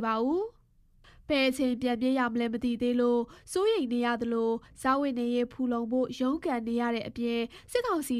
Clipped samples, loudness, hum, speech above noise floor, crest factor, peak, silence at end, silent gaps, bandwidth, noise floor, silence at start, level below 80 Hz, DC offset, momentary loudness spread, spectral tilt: under 0.1%; -29 LUFS; none; 33 dB; 18 dB; -12 dBFS; 0 s; none; 14.5 kHz; -62 dBFS; 0 s; -60 dBFS; under 0.1%; 5 LU; -4.5 dB/octave